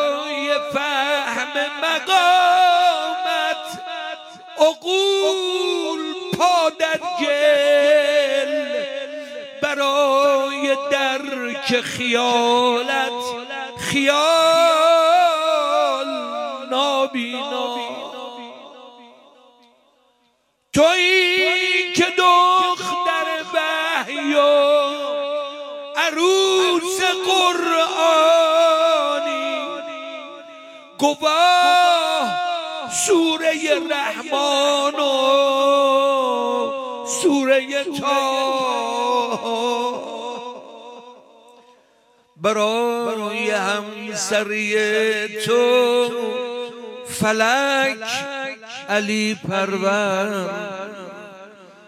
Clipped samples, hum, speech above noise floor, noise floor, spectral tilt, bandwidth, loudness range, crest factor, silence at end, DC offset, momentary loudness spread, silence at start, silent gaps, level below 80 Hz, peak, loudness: under 0.1%; none; 46 dB; -65 dBFS; -2.5 dB/octave; 16 kHz; 7 LU; 18 dB; 0.2 s; under 0.1%; 15 LU; 0 s; none; -66 dBFS; -2 dBFS; -18 LUFS